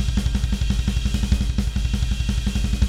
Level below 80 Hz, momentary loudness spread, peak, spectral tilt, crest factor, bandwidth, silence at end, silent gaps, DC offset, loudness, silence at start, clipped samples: -22 dBFS; 2 LU; -6 dBFS; -5.5 dB/octave; 16 dB; 13 kHz; 0 s; none; under 0.1%; -24 LUFS; 0 s; under 0.1%